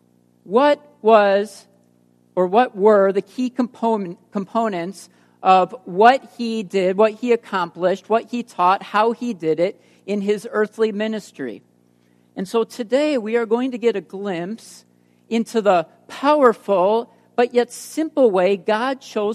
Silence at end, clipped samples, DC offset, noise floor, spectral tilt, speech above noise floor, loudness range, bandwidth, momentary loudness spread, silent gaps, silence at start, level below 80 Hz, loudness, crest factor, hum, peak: 0 s; under 0.1%; under 0.1%; -58 dBFS; -5.5 dB/octave; 39 dB; 5 LU; 13.5 kHz; 13 LU; none; 0.5 s; -74 dBFS; -19 LUFS; 20 dB; 60 Hz at -50 dBFS; 0 dBFS